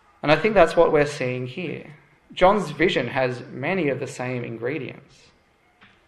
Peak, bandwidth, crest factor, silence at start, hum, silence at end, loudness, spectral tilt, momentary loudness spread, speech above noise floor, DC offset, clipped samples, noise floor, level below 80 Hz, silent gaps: -2 dBFS; 12 kHz; 22 dB; 0.25 s; none; 1.1 s; -22 LUFS; -6 dB/octave; 15 LU; 38 dB; under 0.1%; under 0.1%; -60 dBFS; -50 dBFS; none